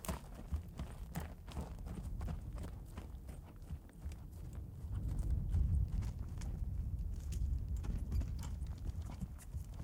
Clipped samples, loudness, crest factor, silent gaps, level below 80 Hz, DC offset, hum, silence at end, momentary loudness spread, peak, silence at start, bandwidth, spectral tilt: under 0.1%; -44 LUFS; 20 dB; none; -44 dBFS; under 0.1%; none; 0 s; 12 LU; -22 dBFS; 0 s; 17.5 kHz; -7 dB/octave